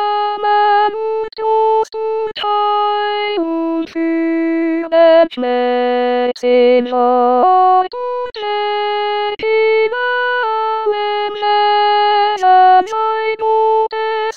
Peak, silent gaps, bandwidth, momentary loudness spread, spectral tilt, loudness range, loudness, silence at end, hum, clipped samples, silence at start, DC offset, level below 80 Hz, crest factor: 0 dBFS; none; 7.4 kHz; 8 LU; -3.5 dB/octave; 4 LU; -14 LUFS; 0 s; none; under 0.1%; 0 s; 0.7%; -60 dBFS; 14 dB